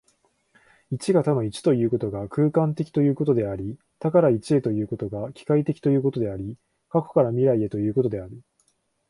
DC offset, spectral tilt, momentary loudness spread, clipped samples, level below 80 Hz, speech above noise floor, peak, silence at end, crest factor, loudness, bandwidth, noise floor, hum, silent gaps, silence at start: under 0.1%; -8.5 dB/octave; 11 LU; under 0.1%; -56 dBFS; 46 dB; -6 dBFS; 0.7 s; 18 dB; -23 LUFS; 11.5 kHz; -68 dBFS; none; none; 0.9 s